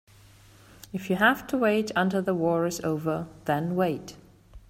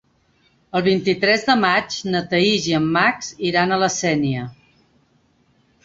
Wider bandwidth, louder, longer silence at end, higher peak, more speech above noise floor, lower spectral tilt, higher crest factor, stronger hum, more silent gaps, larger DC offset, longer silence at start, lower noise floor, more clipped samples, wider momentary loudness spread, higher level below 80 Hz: first, 16 kHz vs 7.8 kHz; second, -26 LUFS vs -19 LUFS; second, 0.1 s vs 1.35 s; second, -8 dBFS vs -2 dBFS; second, 28 dB vs 42 dB; first, -5.5 dB/octave vs -4 dB/octave; about the same, 20 dB vs 18 dB; neither; neither; neither; first, 0.95 s vs 0.75 s; second, -54 dBFS vs -60 dBFS; neither; first, 12 LU vs 8 LU; about the same, -58 dBFS vs -56 dBFS